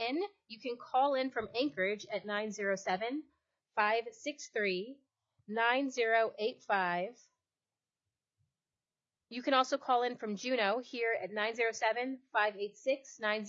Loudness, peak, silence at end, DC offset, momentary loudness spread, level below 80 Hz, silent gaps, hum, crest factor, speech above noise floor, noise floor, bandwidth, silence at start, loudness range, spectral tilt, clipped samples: -34 LUFS; -14 dBFS; 0 s; under 0.1%; 10 LU; -84 dBFS; none; none; 20 dB; over 56 dB; under -90 dBFS; 7.6 kHz; 0 s; 4 LU; -1.5 dB/octave; under 0.1%